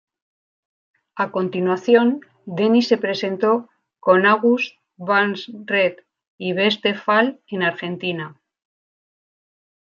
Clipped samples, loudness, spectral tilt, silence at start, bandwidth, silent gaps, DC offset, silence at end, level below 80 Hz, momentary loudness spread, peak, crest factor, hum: under 0.1%; -19 LUFS; -6 dB/octave; 1.15 s; 7.2 kHz; 6.28-6.38 s; under 0.1%; 1.5 s; -72 dBFS; 14 LU; -2 dBFS; 18 dB; none